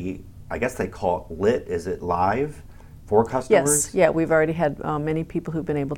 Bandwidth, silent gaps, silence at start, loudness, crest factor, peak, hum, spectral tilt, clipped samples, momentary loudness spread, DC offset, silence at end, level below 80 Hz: 19 kHz; none; 0 s; -23 LUFS; 18 dB; -4 dBFS; none; -5 dB/octave; under 0.1%; 10 LU; under 0.1%; 0 s; -44 dBFS